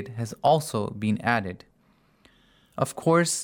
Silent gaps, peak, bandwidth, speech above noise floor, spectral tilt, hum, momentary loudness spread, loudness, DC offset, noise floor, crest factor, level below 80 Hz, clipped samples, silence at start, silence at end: none; -6 dBFS; over 20 kHz; 38 dB; -5 dB/octave; none; 15 LU; -25 LUFS; under 0.1%; -63 dBFS; 20 dB; -64 dBFS; under 0.1%; 0 s; 0 s